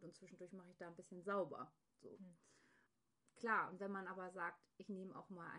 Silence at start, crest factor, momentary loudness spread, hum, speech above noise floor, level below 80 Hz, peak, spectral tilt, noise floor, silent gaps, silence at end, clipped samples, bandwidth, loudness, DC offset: 0 s; 22 dB; 19 LU; none; 35 dB; under -90 dBFS; -28 dBFS; -6 dB/octave; -84 dBFS; none; 0 s; under 0.1%; 10 kHz; -48 LUFS; under 0.1%